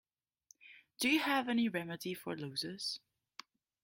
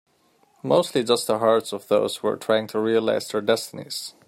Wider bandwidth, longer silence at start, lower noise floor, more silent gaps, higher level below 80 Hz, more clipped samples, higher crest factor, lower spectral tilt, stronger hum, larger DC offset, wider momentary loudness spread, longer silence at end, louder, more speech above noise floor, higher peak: about the same, 16.5 kHz vs 16 kHz; about the same, 0.65 s vs 0.65 s; first, -69 dBFS vs -62 dBFS; neither; second, -80 dBFS vs -70 dBFS; neither; about the same, 18 dB vs 18 dB; about the same, -3.5 dB/octave vs -4 dB/octave; neither; neither; first, 23 LU vs 8 LU; first, 0.85 s vs 0.15 s; second, -36 LUFS vs -23 LUFS; second, 33 dB vs 40 dB; second, -20 dBFS vs -4 dBFS